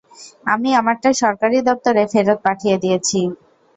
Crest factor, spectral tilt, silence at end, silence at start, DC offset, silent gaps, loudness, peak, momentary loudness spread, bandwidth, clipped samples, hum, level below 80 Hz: 16 dB; -4 dB/octave; 0.4 s; 0.2 s; under 0.1%; none; -17 LUFS; -2 dBFS; 5 LU; 8.4 kHz; under 0.1%; none; -60 dBFS